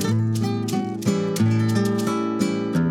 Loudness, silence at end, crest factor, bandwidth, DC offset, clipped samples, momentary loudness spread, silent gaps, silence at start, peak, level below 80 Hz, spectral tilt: -22 LUFS; 0 s; 14 dB; 16 kHz; under 0.1%; under 0.1%; 3 LU; none; 0 s; -8 dBFS; -58 dBFS; -6.5 dB/octave